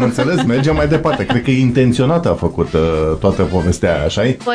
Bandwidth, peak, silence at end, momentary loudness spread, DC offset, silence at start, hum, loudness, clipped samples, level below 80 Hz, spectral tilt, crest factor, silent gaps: 11 kHz; 0 dBFS; 0 s; 3 LU; under 0.1%; 0 s; none; -15 LUFS; under 0.1%; -30 dBFS; -6.5 dB/octave; 14 dB; none